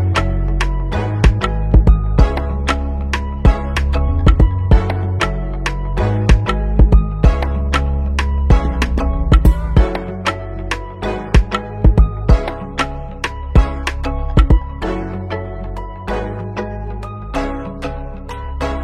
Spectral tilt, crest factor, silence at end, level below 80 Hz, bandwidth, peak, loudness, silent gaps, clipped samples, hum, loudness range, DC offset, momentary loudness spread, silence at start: -7 dB/octave; 14 dB; 0 s; -16 dBFS; 9.6 kHz; 0 dBFS; -17 LUFS; none; under 0.1%; none; 5 LU; under 0.1%; 11 LU; 0 s